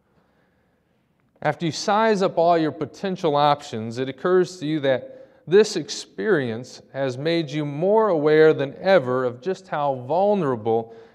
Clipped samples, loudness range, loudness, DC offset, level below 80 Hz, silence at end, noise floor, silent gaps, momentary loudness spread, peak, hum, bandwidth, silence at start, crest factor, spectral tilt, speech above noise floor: under 0.1%; 3 LU; -22 LUFS; under 0.1%; -72 dBFS; 0.15 s; -65 dBFS; none; 10 LU; -4 dBFS; none; 10.5 kHz; 1.4 s; 18 dB; -5.5 dB/octave; 44 dB